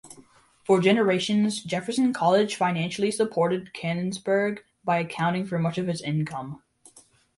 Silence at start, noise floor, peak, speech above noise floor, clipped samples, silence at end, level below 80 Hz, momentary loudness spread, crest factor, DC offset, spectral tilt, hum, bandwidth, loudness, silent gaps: 0.05 s; -56 dBFS; -8 dBFS; 32 dB; under 0.1%; 0.8 s; -66 dBFS; 9 LU; 18 dB; under 0.1%; -5.5 dB/octave; none; 11.5 kHz; -25 LUFS; none